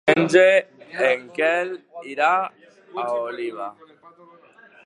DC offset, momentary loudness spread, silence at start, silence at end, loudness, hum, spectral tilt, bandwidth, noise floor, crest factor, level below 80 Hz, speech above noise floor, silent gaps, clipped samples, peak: under 0.1%; 20 LU; 0.05 s; 1.15 s; -21 LUFS; none; -5 dB/octave; 11 kHz; -51 dBFS; 22 dB; -72 dBFS; 30 dB; none; under 0.1%; 0 dBFS